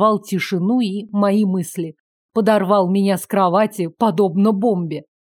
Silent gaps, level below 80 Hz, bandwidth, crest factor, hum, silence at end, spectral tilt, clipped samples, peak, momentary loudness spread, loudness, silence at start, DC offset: 2.00-2.29 s; -72 dBFS; 17 kHz; 16 dB; none; 0.2 s; -6.5 dB/octave; under 0.1%; -2 dBFS; 8 LU; -18 LUFS; 0 s; under 0.1%